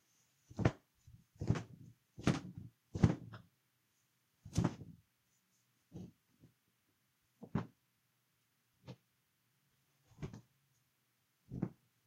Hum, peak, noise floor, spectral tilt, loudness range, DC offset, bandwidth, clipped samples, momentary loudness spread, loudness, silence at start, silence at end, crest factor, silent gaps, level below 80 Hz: none; -14 dBFS; -80 dBFS; -7 dB/octave; 18 LU; under 0.1%; 15.5 kHz; under 0.1%; 24 LU; -40 LUFS; 0.5 s; 0.35 s; 30 dB; none; -62 dBFS